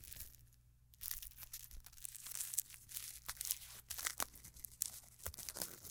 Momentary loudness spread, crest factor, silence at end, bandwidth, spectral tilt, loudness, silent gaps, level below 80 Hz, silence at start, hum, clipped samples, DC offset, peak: 11 LU; 38 dB; 0 s; 18 kHz; 0 dB/octave; -45 LUFS; none; -64 dBFS; 0 s; none; under 0.1%; under 0.1%; -10 dBFS